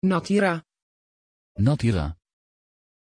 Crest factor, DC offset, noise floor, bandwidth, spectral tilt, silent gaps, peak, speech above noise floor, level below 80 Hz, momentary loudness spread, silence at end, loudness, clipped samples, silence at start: 16 dB; under 0.1%; under -90 dBFS; 10.5 kHz; -7 dB/octave; 0.82-1.55 s; -10 dBFS; over 68 dB; -44 dBFS; 12 LU; 0.9 s; -24 LUFS; under 0.1%; 0 s